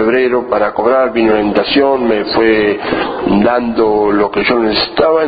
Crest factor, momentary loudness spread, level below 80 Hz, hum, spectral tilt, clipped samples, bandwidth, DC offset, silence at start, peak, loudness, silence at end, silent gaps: 12 dB; 3 LU; -40 dBFS; none; -9 dB/octave; under 0.1%; 5 kHz; under 0.1%; 0 s; 0 dBFS; -12 LUFS; 0 s; none